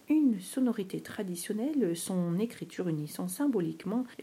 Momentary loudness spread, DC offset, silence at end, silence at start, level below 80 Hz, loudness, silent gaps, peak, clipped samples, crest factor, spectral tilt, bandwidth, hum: 8 LU; under 0.1%; 0 s; 0.1 s; -78 dBFS; -32 LUFS; none; -18 dBFS; under 0.1%; 14 dB; -6 dB/octave; 16 kHz; none